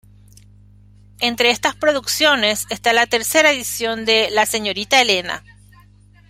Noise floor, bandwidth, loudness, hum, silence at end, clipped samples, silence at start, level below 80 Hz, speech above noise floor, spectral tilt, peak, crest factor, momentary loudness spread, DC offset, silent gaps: -48 dBFS; 16 kHz; -16 LUFS; 50 Hz at -45 dBFS; 0.9 s; under 0.1%; 1.2 s; -52 dBFS; 31 dB; -1 dB/octave; 0 dBFS; 18 dB; 7 LU; under 0.1%; none